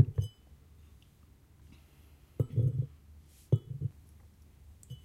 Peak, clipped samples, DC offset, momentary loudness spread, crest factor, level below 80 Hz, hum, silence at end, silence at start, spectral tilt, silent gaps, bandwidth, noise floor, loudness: -10 dBFS; under 0.1%; under 0.1%; 27 LU; 26 dB; -54 dBFS; none; 0.1 s; 0 s; -9 dB/octave; none; 13.5 kHz; -60 dBFS; -34 LUFS